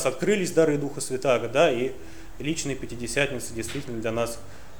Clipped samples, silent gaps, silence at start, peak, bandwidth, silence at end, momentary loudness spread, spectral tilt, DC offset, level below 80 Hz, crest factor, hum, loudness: under 0.1%; none; 0 s; -6 dBFS; over 20 kHz; 0 s; 11 LU; -4.5 dB/octave; 1%; -50 dBFS; 20 dB; none; -26 LUFS